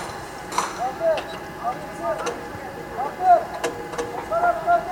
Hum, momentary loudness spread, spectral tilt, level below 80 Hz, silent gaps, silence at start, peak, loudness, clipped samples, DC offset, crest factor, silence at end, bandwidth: none; 14 LU; -4 dB/octave; -50 dBFS; none; 0 s; -6 dBFS; -25 LUFS; under 0.1%; under 0.1%; 18 dB; 0 s; 18 kHz